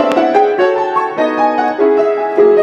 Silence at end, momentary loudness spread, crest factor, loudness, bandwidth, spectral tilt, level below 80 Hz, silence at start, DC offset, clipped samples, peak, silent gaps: 0 s; 4 LU; 12 dB; -12 LUFS; 7.6 kHz; -5.5 dB/octave; -64 dBFS; 0 s; under 0.1%; under 0.1%; 0 dBFS; none